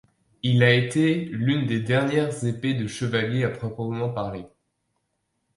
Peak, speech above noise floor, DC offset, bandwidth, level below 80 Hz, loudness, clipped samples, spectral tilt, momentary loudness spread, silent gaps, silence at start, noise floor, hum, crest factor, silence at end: -4 dBFS; 52 dB; under 0.1%; 11.5 kHz; -58 dBFS; -24 LUFS; under 0.1%; -6.5 dB/octave; 11 LU; none; 0.45 s; -75 dBFS; none; 20 dB; 1.1 s